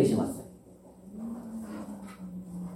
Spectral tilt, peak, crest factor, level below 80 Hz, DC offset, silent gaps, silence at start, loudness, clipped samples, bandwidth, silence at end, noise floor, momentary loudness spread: -7 dB/octave; -12 dBFS; 22 dB; -62 dBFS; under 0.1%; none; 0 s; -36 LUFS; under 0.1%; 16 kHz; 0 s; -53 dBFS; 20 LU